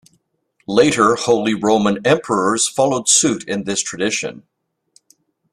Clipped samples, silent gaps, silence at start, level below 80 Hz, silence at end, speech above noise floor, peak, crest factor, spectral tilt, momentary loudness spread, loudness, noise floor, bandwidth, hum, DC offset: under 0.1%; none; 0.7 s; -56 dBFS; 1.15 s; 49 dB; 0 dBFS; 18 dB; -3 dB/octave; 8 LU; -16 LUFS; -65 dBFS; 13.5 kHz; none; under 0.1%